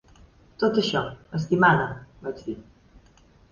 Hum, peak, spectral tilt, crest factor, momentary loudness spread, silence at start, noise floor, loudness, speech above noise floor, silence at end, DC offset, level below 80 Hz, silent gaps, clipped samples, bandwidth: none; -6 dBFS; -6 dB/octave; 20 dB; 17 LU; 0.6 s; -56 dBFS; -24 LUFS; 32 dB; 0.9 s; under 0.1%; -54 dBFS; none; under 0.1%; 7.2 kHz